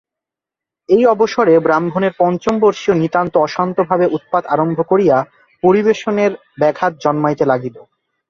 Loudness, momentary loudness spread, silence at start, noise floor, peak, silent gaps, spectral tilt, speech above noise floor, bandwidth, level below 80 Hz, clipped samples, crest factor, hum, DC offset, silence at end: -15 LUFS; 5 LU; 0.9 s; -86 dBFS; -2 dBFS; none; -7 dB/octave; 72 dB; 7.4 kHz; -56 dBFS; under 0.1%; 14 dB; none; under 0.1%; 0.5 s